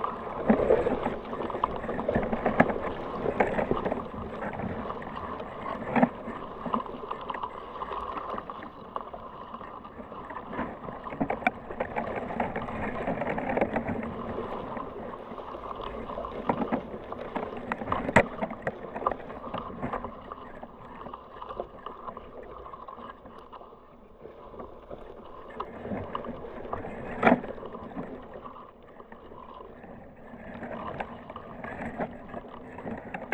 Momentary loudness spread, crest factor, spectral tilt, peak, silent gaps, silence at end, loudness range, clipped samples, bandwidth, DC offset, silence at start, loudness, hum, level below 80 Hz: 19 LU; 30 dB; -7.5 dB/octave; -2 dBFS; none; 0 s; 13 LU; under 0.1%; 11 kHz; under 0.1%; 0 s; -32 LUFS; none; -50 dBFS